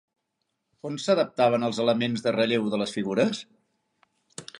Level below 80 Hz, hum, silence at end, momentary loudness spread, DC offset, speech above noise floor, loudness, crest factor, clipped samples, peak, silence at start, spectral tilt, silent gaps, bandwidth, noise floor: -72 dBFS; none; 0 s; 17 LU; under 0.1%; 55 dB; -25 LUFS; 20 dB; under 0.1%; -8 dBFS; 0.85 s; -5 dB/octave; none; 11 kHz; -79 dBFS